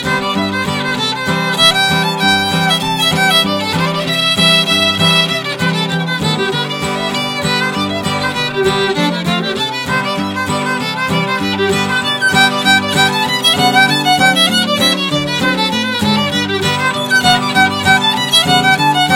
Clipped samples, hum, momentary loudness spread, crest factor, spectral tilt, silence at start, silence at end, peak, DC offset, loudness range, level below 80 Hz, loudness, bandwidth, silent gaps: under 0.1%; none; 7 LU; 14 dB; -3.5 dB/octave; 0 s; 0 s; 0 dBFS; under 0.1%; 5 LU; -46 dBFS; -12 LUFS; 17 kHz; none